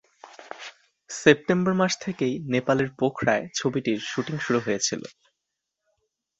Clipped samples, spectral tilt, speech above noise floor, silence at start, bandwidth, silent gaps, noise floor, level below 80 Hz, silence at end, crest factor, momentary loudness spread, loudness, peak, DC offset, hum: under 0.1%; -4.5 dB/octave; 59 dB; 0.25 s; 8.2 kHz; none; -83 dBFS; -62 dBFS; 1.3 s; 24 dB; 19 LU; -24 LUFS; -2 dBFS; under 0.1%; none